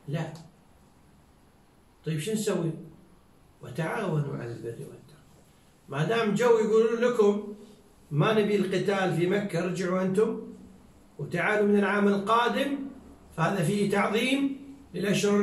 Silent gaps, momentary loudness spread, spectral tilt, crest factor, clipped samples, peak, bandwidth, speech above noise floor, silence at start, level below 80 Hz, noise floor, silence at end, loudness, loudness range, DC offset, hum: none; 17 LU; -6 dB/octave; 16 dB; under 0.1%; -12 dBFS; 13 kHz; 33 dB; 0.05 s; -64 dBFS; -59 dBFS; 0 s; -27 LUFS; 9 LU; under 0.1%; none